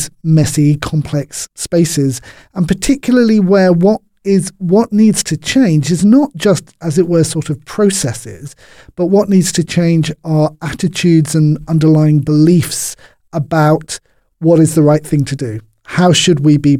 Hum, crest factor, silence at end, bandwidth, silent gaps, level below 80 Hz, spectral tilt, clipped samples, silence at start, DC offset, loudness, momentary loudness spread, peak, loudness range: none; 12 dB; 0 s; 15.5 kHz; none; -40 dBFS; -6 dB/octave; under 0.1%; 0 s; under 0.1%; -12 LUFS; 11 LU; 0 dBFS; 3 LU